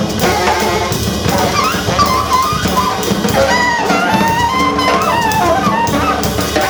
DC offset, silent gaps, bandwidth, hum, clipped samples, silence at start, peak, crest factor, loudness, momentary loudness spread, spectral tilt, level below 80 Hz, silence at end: under 0.1%; none; over 20 kHz; none; under 0.1%; 0 s; 0 dBFS; 12 dB; -13 LUFS; 3 LU; -4 dB/octave; -30 dBFS; 0 s